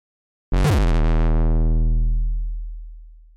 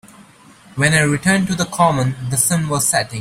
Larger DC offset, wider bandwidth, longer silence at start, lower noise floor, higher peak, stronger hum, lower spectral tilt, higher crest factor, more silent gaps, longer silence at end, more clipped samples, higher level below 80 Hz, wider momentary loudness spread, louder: neither; second, 9.6 kHz vs 16.5 kHz; first, 0.5 s vs 0.2 s; second, -40 dBFS vs -45 dBFS; second, -14 dBFS vs 0 dBFS; neither; first, -7 dB/octave vs -4 dB/octave; second, 6 dB vs 16 dB; neither; first, 0.25 s vs 0 s; neither; first, -20 dBFS vs -48 dBFS; first, 15 LU vs 5 LU; second, -22 LUFS vs -16 LUFS